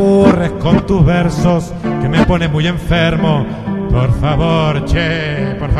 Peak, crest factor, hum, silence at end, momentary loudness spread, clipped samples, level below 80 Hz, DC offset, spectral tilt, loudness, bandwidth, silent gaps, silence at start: 0 dBFS; 12 dB; none; 0 s; 6 LU; under 0.1%; -24 dBFS; under 0.1%; -7.5 dB/octave; -13 LUFS; 12 kHz; none; 0 s